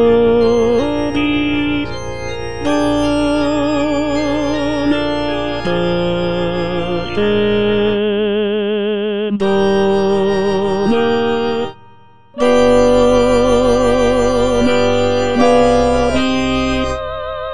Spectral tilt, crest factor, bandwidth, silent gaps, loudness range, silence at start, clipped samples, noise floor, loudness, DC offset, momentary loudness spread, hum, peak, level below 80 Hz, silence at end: -5.5 dB/octave; 14 dB; 10 kHz; none; 4 LU; 0 s; under 0.1%; -45 dBFS; -15 LUFS; 4%; 8 LU; none; 0 dBFS; -34 dBFS; 0 s